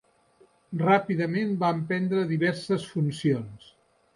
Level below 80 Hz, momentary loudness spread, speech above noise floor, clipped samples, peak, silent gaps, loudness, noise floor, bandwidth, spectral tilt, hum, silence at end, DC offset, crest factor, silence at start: -68 dBFS; 6 LU; 35 dB; under 0.1%; -8 dBFS; none; -26 LUFS; -61 dBFS; 11.5 kHz; -7.5 dB/octave; none; 0.6 s; under 0.1%; 18 dB; 0.7 s